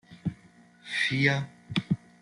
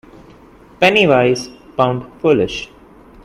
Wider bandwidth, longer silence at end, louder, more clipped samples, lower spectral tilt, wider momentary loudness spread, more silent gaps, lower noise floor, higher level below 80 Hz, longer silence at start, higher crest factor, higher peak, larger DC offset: second, 11 kHz vs 15 kHz; second, 0.25 s vs 0.6 s; second, -29 LUFS vs -15 LUFS; neither; about the same, -5.5 dB/octave vs -5.5 dB/octave; about the same, 13 LU vs 15 LU; neither; first, -57 dBFS vs -43 dBFS; second, -64 dBFS vs -48 dBFS; second, 0.1 s vs 0.8 s; about the same, 22 dB vs 18 dB; second, -10 dBFS vs 0 dBFS; neither